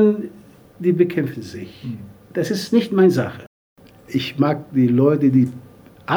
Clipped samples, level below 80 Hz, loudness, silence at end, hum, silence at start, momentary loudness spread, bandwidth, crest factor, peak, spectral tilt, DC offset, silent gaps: under 0.1%; -60 dBFS; -19 LUFS; 0 s; none; 0 s; 19 LU; 20 kHz; 16 dB; -2 dBFS; -7.5 dB/octave; under 0.1%; 3.47-3.76 s